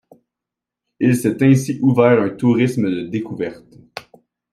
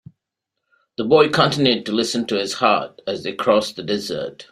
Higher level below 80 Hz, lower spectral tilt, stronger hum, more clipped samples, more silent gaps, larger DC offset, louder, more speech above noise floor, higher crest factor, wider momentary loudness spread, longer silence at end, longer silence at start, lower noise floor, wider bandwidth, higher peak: about the same, -58 dBFS vs -60 dBFS; first, -7.5 dB/octave vs -4.5 dB/octave; neither; neither; neither; neither; about the same, -17 LUFS vs -19 LUFS; first, 69 dB vs 62 dB; about the same, 18 dB vs 18 dB; first, 21 LU vs 12 LU; first, 0.55 s vs 0.1 s; about the same, 1 s vs 1 s; first, -85 dBFS vs -81 dBFS; about the same, 15 kHz vs 15 kHz; about the same, 0 dBFS vs -2 dBFS